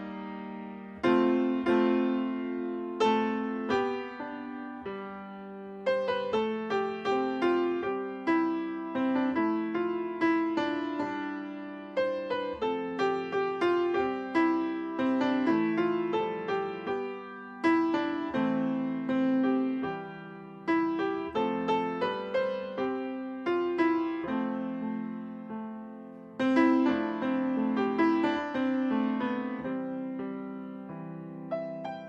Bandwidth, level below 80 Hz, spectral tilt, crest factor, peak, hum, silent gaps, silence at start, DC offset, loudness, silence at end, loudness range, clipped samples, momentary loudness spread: 7.6 kHz; -68 dBFS; -7 dB/octave; 18 dB; -12 dBFS; none; none; 0 s; under 0.1%; -30 LUFS; 0 s; 4 LU; under 0.1%; 13 LU